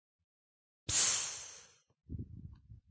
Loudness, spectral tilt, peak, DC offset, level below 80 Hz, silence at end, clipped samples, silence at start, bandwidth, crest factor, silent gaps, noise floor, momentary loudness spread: -32 LUFS; -0.5 dB/octave; -18 dBFS; under 0.1%; -58 dBFS; 0.15 s; under 0.1%; 0.9 s; 8 kHz; 24 dB; none; -59 dBFS; 25 LU